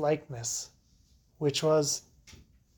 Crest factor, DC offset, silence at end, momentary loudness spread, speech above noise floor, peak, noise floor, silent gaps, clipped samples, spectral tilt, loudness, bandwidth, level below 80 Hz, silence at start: 18 dB; under 0.1%; 0.45 s; 9 LU; 35 dB; -14 dBFS; -64 dBFS; none; under 0.1%; -4 dB/octave; -30 LUFS; 19 kHz; -64 dBFS; 0 s